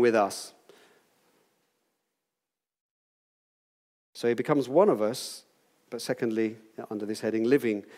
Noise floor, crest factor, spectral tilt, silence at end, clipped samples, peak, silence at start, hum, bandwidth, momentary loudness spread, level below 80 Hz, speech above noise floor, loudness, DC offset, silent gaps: -90 dBFS; 22 dB; -5 dB/octave; 0 s; under 0.1%; -8 dBFS; 0 s; none; 16 kHz; 19 LU; -86 dBFS; 63 dB; -28 LUFS; under 0.1%; 2.81-4.13 s